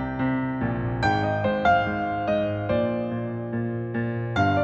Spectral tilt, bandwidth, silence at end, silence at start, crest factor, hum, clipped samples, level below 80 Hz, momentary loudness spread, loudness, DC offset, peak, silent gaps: -8 dB/octave; 8 kHz; 0 s; 0 s; 16 dB; none; under 0.1%; -46 dBFS; 7 LU; -25 LUFS; under 0.1%; -8 dBFS; none